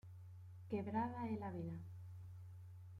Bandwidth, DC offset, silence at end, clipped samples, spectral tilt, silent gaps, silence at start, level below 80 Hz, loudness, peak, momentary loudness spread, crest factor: 11.5 kHz; under 0.1%; 0 s; under 0.1%; -9.5 dB/octave; none; 0.05 s; -76 dBFS; -47 LUFS; -28 dBFS; 15 LU; 20 dB